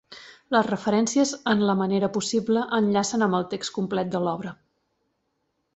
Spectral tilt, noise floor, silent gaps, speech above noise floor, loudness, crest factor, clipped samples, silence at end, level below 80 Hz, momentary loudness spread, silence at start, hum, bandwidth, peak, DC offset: -5 dB/octave; -75 dBFS; none; 51 dB; -24 LUFS; 18 dB; under 0.1%; 1.2 s; -64 dBFS; 7 LU; 0.1 s; none; 8.2 kHz; -6 dBFS; under 0.1%